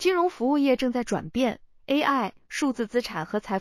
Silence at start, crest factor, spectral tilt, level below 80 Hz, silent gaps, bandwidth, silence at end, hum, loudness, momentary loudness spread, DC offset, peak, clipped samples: 0 s; 16 dB; -4.5 dB/octave; -56 dBFS; none; 15 kHz; 0 s; none; -26 LUFS; 7 LU; under 0.1%; -10 dBFS; under 0.1%